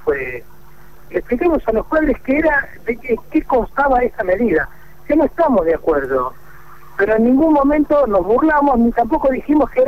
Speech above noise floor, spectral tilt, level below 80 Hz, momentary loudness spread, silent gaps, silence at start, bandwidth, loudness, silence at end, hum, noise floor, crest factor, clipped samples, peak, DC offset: 29 dB; -8 dB/octave; -34 dBFS; 10 LU; none; 0.05 s; 15 kHz; -16 LUFS; 0 s; none; -45 dBFS; 10 dB; under 0.1%; -6 dBFS; 2%